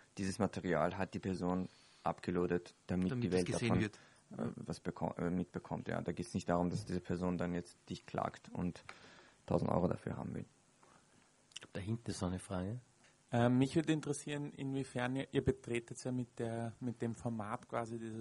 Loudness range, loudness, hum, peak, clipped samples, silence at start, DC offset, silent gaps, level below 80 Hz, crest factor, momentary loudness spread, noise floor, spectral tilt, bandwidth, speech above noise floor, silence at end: 5 LU; -39 LUFS; none; -16 dBFS; under 0.1%; 0.15 s; under 0.1%; none; -64 dBFS; 22 dB; 10 LU; -69 dBFS; -6.5 dB/octave; 11.5 kHz; 31 dB; 0 s